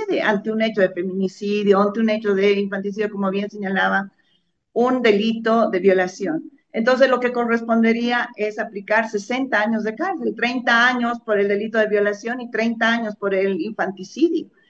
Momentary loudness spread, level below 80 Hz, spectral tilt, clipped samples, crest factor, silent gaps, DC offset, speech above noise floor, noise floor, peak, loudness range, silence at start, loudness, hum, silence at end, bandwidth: 8 LU; -70 dBFS; -5.5 dB/octave; under 0.1%; 18 dB; none; under 0.1%; 47 dB; -66 dBFS; -2 dBFS; 2 LU; 0 s; -20 LUFS; none; 0.25 s; 7.8 kHz